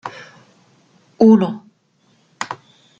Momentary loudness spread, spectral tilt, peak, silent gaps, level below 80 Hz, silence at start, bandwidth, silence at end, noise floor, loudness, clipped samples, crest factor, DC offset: 22 LU; -7 dB/octave; -2 dBFS; none; -64 dBFS; 0.05 s; 7.6 kHz; 0.45 s; -59 dBFS; -16 LUFS; under 0.1%; 18 dB; under 0.1%